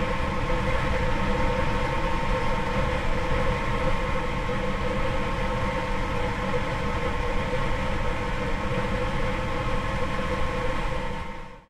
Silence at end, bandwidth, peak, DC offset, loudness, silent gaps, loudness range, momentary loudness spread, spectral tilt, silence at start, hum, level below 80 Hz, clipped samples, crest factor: 0.1 s; 11 kHz; -12 dBFS; under 0.1%; -28 LUFS; none; 2 LU; 3 LU; -6 dB/octave; 0 s; none; -30 dBFS; under 0.1%; 14 dB